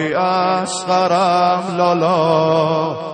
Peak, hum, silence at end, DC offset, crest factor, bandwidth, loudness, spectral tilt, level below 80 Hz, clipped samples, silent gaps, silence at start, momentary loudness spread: -2 dBFS; none; 0 s; under 0.1%; 14 dB; 9.4 kHz; -16 LUFS; -5 dB/octave; -58 dBFS; under 0.1%; none; 0 s; 4 LU